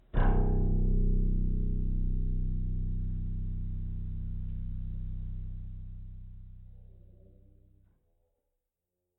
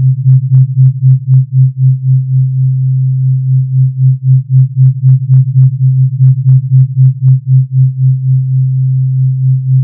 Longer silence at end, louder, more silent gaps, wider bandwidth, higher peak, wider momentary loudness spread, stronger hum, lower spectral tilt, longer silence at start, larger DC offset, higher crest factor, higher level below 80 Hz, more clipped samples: first, 2.2 s vs 0 s; second, -35 LUFS vs -9 LUFS; neither; first, 3 kHz vs 0.3 kHz; second, -16 dBFS vs 0 dBFS; first, 18 LU vs 4 LU; neither; second, -12 dB/octave vs -15.5 dB/octave; first, 0.15 s vs 0 s; neither; first, 16 dB vs 8 dB; first, -32 dBFS vs -46 dBFS; second, under 0.1% vs 0.5%